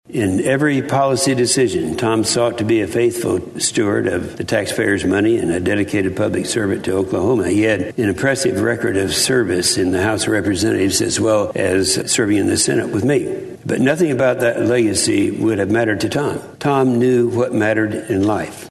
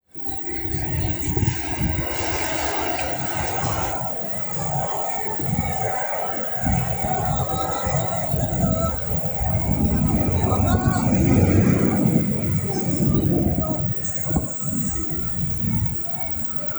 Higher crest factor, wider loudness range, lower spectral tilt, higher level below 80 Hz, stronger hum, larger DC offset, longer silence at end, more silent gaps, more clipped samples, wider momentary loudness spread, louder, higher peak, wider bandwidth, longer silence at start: about the same, 14 dB vs 18 dB; about the same, 2 LU vs 4 LU; second, -4.5 dB/octave vs -6 dB/octave; second, -48 dBFS vs -34 dBFS; neither; neither; about the same, 0 s vs 0 s; neither; neither; about the same, 4 LU vs 4 LU; first, -17 LUFS vs -21 LUFS; about the same, -2 dBFS vs -4 dBFS; second, 12.5 kHz vs over 20 kHz; about the same, 0.1 s vs 0.15 s